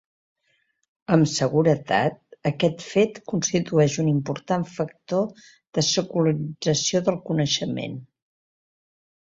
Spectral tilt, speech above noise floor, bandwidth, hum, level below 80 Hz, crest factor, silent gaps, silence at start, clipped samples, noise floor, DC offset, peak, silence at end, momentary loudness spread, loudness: -5 dB/octave; 47 dB; 7.8 kHz; none; -62 dBFS; 22 dB; 5.67-5.73 s; 1.1 s; under 0.1%; -70 dBFS; under 0.1%; -2 dBFS; 1.35 s; 9 LU; -23 LUFS